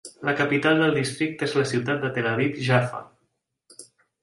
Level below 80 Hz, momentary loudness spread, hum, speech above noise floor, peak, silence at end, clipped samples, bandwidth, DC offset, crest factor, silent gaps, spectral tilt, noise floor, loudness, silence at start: -64 dBFS; 7 LU; none; 51 dB; -6 dBFS; 0.4 s; under 0.1%; 11.5 kHz; under 0.1%; 20 dB; none; -5.5 dB/octave; -74 dBFS; -23 LUFS; 0.05 s